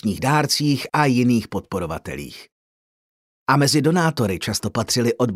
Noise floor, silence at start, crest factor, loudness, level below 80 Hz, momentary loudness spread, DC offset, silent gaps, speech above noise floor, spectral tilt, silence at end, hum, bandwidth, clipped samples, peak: under -90 dBFS; 0.05 s; 18 dB; -20 LUFS; -50 dBFS; 13 LU; under 0.1%; 2.52-3.46 s; over 70 dB; -5 dB/octave; 0 s; none; 16 kHz; under 0.1%; -4 dBFS